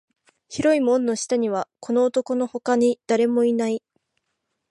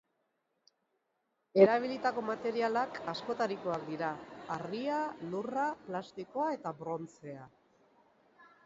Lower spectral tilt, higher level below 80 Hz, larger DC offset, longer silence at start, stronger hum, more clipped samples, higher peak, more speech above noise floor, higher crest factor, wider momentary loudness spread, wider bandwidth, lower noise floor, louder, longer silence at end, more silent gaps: about the same, -4.5 dB/octave vs -4 dB/octave; first, -66 dBFS vs -76 dBFS; neither; second, 0.5 s vs 1.55 s; neither; neither; about the same, -8 dBFS vs -10 dBFS; first, 56 dB vs 47 dB; second, 14 dB vs 24 dB; second, 7 LU vs 15 LU; first, 11.5 kHz vs 7.6 kHz; second, -77 dBFS vs -81 dBFS; first, -22 LUFS vs -34 LUFS; first, 0.9 s vs 0.2 s; neither